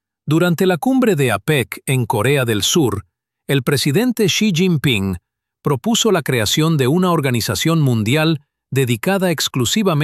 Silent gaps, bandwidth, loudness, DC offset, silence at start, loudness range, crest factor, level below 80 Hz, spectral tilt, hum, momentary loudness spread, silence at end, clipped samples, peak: none; 15 kHz; -16 LUFS; under 0.1%; 0.25 s; 1 LU; 14 dB; -50 dBFS; -5 dB/octave; none; 5 LU; 0 s; under 0.1%; -4 dBFS